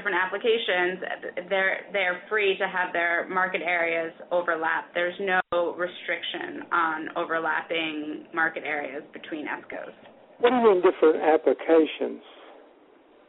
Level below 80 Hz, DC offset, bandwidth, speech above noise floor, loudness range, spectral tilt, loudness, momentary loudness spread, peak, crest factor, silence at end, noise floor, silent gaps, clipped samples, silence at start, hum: -72 dBFS; under 0.1%; 4.1 kHz; 30 dB; 5 LU; -1 dB/octave; -25 LUFS; 13 LU; -8 dBFS; 18 dB; 0.75 s; -56 dBFS; none; under 0.1%; 0 s; none